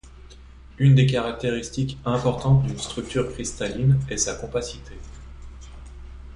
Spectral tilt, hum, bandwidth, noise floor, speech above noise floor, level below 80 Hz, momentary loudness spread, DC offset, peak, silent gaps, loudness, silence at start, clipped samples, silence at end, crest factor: -5.5 dB/octave; none; 11 kHz; -45 dBFS; 23 dB; -42 dBFS; 25 LU; under 0.1%; -6 dBFS; none; -23 LUFS; 0.05 s; under 0.1%; 0 s; 18 dB